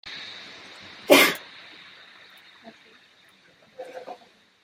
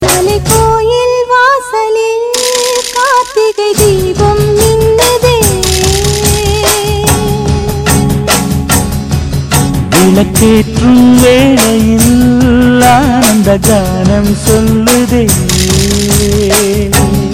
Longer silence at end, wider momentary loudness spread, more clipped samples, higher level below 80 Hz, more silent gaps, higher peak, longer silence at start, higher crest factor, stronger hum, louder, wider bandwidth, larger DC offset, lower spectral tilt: first, 0.5 s vs 0 s; first, 28 LU vs 5 LU; second, under 0.1% vs 0.3%; second, -72 dBFS vs -20 dBFS; neither; about the same, 0 dBFS vs 0 dBFS; about the same, 0.05 s vs 0 s; first, 28 dB vs 8 dB; neither; second, -18 LUFS vs -8 LUFS; about the same, 16 kHz vs 17 kHz; neither; second, -1.5 dB/octave vs -4.5 dB/octave